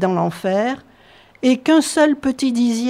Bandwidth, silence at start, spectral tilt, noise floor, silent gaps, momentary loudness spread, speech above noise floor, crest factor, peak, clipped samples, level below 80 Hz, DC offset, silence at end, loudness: 15 kHz; 0 s; -5 dB/octave; -48 dBFS; none; 7 LU; 31 dB; 14 dB; -4 dBFS; under 0.1%; -56 dBFS; under 0.1%; 0 s; -17 LUFS